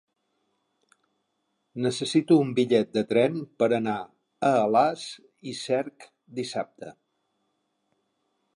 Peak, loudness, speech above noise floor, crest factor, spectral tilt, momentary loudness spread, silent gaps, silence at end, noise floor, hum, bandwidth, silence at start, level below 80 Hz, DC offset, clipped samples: -8 dBFS; -25 LUFS; 52 dB; 20 dB; -5.5 dB/octave; 18 LU; none; 1.65 s; -77 dBFS; none; 11 kHz; 1.75 s; -74 dBFS; under 0.1%; under 0.1%